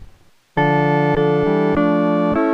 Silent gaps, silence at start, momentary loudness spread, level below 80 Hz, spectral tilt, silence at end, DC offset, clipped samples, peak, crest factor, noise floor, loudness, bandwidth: none; 0 s; 2 LU; -42 dBFS; -9 dB/octave; 0 s; under 0.1%; under 0.1%; -4 dBFS; 12 dB; -47 dBFS; -17 LUFS; 6.4 kHz